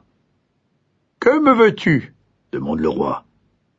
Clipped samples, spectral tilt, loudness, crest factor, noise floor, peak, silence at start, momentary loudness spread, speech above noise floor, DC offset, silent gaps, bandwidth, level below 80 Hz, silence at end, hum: under 0.1%; -7.5 dB/octave; -17 LUFS; 18 dB; -66 dBFS; -2 dBFS; 1.2 s; 15 LU; 50 dB; under 0.1%; none; 7.8 kHz; -50 dBFS; 0.6 s; none